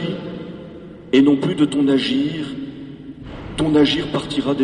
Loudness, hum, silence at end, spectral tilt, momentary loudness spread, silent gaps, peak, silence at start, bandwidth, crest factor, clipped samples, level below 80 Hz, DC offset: -18 LUFS; none; 0 s; -6 dB/octave; 20 LU; none; -4 dBFS; 0 s; 10.5 kHz; 16 dB; under 0.1%; -46 dBFS; under 0.1%